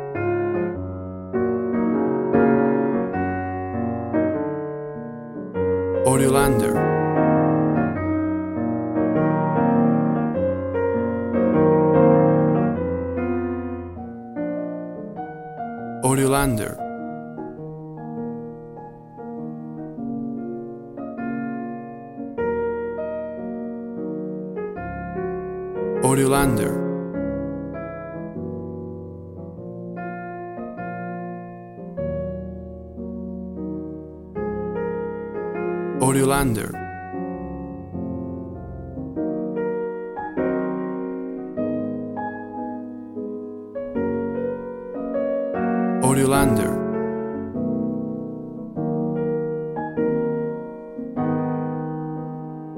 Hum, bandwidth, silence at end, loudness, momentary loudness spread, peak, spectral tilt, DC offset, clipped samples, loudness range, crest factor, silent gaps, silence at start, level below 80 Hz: none; 16.5 kHz; 0 s; -24 LUFS; 15 LU; -4 dBFS; -6.5 dB/octave; under 0.1%; under 0.1%; 12 LU; 20 dB; none; 0 s; -46 dBFS